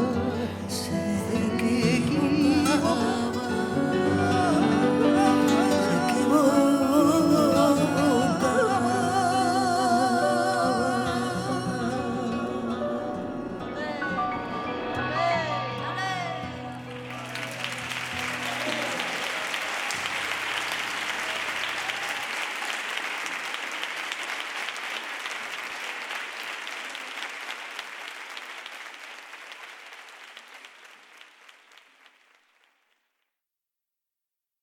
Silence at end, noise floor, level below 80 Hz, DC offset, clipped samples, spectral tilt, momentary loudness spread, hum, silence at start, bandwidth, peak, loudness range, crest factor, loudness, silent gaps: 3.4 s; -88 dBFS; -58 dBFS; under 0.1%; under 0.1%; -4.5 dB/octave; 16 LU; none; 0 s; 17.5 kHz; -8 dBFS; 15 LU; 18 dB; -26 LUFS; none